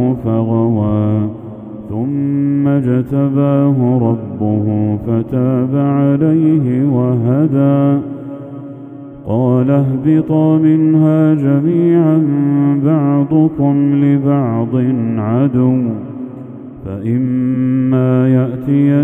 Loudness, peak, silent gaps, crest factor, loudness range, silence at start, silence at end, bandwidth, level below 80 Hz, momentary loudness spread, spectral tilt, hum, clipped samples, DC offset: -13 LUFS; 0 dBFS; none; 12 dB; 4 LU; 0 s; 0 s; 3.6 kHz; -48 dBFS; 15 LU; -12 dB/octave; none; under 0.1%; under 0.1%